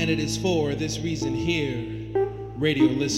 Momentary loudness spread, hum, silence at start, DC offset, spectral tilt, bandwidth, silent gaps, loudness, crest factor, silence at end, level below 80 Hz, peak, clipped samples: 7 LU; none; 0 s; under 0.1%; -5 dB/octave; 14 kHz; none; -25 LUFS; 16 dB; 0 s; -46 dBFS; -8 dBFS; under 0.1%